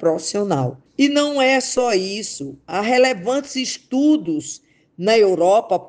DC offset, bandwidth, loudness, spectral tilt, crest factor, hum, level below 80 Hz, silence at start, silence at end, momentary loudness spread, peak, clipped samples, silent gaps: under 0.1%; 10 kHz; -18 LUFS; -4 dB/octave; 16 dB; none; -64 dBFS; 0 s; 0 s; 11 LU; -4 dBFS; under 0.1%; none